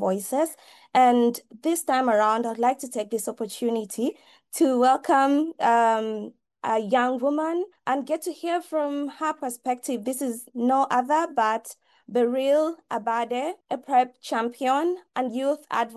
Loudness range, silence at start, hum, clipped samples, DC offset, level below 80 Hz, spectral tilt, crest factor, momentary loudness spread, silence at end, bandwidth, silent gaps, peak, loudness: 4 LU; 0 s; none; under 0.1%; under 0.1%; -78 dBFS; -4 dB/octave; 16 dB; 10 LU; 0 s; 13 kHz; none; -8 dBFS; -25 LUFS